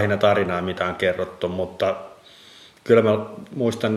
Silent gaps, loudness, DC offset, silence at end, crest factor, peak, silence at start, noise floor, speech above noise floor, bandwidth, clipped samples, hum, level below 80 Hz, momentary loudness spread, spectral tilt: none; -22 LUFS; under 0.1%; 0 s; 20 dB; -2 dBFS; 0 s; -48 dBFS; 27 dB; 13 kHz; under 0.1%; none; -58 dBFS; 14 LU; -6.5 dB/octave